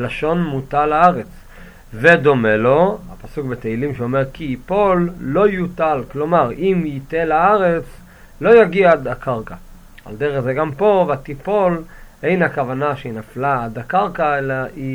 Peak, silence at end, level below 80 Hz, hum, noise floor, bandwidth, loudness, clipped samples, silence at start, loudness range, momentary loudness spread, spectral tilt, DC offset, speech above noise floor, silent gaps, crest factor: 0 dBFS; 0 s; -40 dBFS; none; -39 dBFS; 16 kHz; -17 LUFS; under 0.1%; 0 s; 4 LU; 13 LU; -8 dB/octave; under 0.1%; 23 dB; none; 18 dB